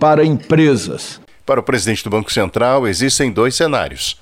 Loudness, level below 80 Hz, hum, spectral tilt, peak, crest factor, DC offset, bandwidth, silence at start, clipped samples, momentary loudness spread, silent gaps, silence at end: -15 LUFS; -42 dBFS; none; -4.5 dB/octave; -2 dBFS; 14 dB; 0.4%; 16.5 kHz; 0 s; under 0.1%; 9 LU; none; 0.1 s